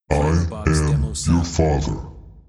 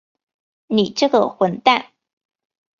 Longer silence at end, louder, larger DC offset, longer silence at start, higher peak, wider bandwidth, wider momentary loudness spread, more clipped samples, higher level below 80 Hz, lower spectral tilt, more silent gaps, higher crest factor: second, 0.1 s vs 0.95 s; about the same, -20 LUFS vs -18 LUFS; neither; second, 0.1 s vs 0.7 s; about the same, -2 dBFS vs 0 dBFS; first, 12 kHz vs 7.4 kHz; first, 9 LU vs 4 LU; neither; first, -28 dBFS vs -66 dBFS; about the same, -6 dB/octave vs -5 dB/octave; neither; about the same, 18 dB vs 20 dB